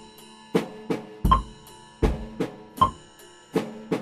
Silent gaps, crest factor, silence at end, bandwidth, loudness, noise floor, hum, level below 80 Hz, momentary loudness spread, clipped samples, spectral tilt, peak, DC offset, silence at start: none; 24 dB; 0 s; 15.5 kHz; -27 LUFS; -50 dBFS; none; -34 dBFS; 23 LU; under 0.1%; -6.5 dB/octave; -4 dBFS; under 0.1%; 0 s